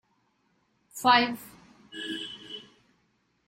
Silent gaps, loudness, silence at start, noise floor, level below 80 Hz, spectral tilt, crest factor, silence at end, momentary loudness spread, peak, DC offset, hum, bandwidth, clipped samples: none; -26 LUFS; 0.95 s; -71 dBFS; -70 dBFS; -2.5 dB/octave; 22 dB; 0.85 s; 22 LU; -10 dBFS; under 0.1%; none; 16 kHz; under 0.1%